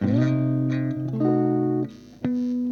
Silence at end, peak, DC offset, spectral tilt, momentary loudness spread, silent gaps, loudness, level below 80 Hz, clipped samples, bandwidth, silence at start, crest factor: 0 s; -10 dBFS; under 0.1%; -10 dB/octave; 7 LU; none; -24 LUFS; -60 dBFS; under 0.1%; 6.6 kHz; 0 s; 12 dB